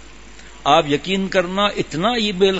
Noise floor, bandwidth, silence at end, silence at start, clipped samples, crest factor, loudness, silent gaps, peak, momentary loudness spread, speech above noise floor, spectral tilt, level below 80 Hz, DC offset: -41 dBFS; 8 kHz; 0 s; 0 s; under 0.1%; 18 dB; -18 LUFS; none; 0 dBFS; 4 LU; 23 dB; -4.5 dB/octave; -44 dBFS; 0.8%